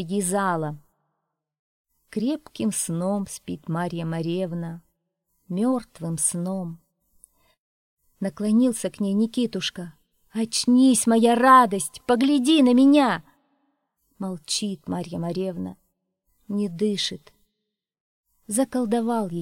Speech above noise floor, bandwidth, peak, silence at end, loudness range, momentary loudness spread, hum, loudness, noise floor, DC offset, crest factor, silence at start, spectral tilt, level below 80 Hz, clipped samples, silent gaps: 60 dB; 16.5 kHz; -4 dBFS; 0 s; 11 LU; 16 LU; none; -23 LUFS; -82 dBFS; under 0.1%; 20 dB; 0 s; -4.5 dB/octave; -66 dBFS; under 0.1%; 1.59-1.84 s, 7.59-7.97 s, 18.00-18.24 s